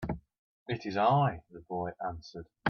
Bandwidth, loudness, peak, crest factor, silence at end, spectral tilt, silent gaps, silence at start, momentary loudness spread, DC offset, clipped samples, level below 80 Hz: 6.6 kHz; -32 LUFS; -14 dBFS; 20 dB; 0 s; -7.5 dB/octave; 0.38-0.66 s; 0 s; 20 LU; under 0.1%; under 0.1%; -56 dBFS